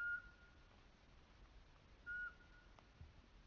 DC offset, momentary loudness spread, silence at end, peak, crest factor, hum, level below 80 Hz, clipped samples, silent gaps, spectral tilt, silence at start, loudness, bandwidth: under 0.1%; 19 LU; 0 s; -38 dBFS; 16 dB; none; -68 dBFS; under 0.1%; none; -2 dB/octave; 0 s; -52 LUFS; 6.8 kHz